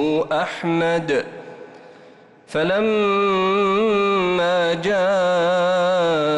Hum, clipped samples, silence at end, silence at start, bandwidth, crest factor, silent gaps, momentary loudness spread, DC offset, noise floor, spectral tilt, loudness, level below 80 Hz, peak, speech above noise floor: none; under 0.1%; 0 s; 0 s; 10.5 kHz; 8 dB; none; 5 LU; under 0.1%; -47 dBFS; -5.5 dB/octave; -19 LUFS; -56 dBFS; -12 dBFS; 28 dB